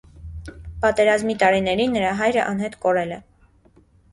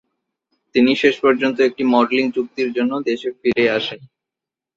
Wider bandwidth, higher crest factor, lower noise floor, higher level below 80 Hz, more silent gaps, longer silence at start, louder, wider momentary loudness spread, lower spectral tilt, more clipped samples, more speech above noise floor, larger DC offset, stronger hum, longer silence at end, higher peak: first, 11.5 kHz vs 7.6 kHz; about the same, 18 dB vs 16 dB; second, -55 dBFS vs -87 dBFS; first, -44 dBFS vs -60 dBFS; neither; second, 0.15 s vs 0.75 s; about the same, -20 LUFS vs -18 LUFS; first, 19 LU vs 7 LU; about the same, -5 dB/octave vs -5.5 dB/octave; neither; second, 35 dB vs 69 dB; neither; neither; first, 0.95 s vs 0.7 s; about the same, -4 dBFS vs -2 dBFS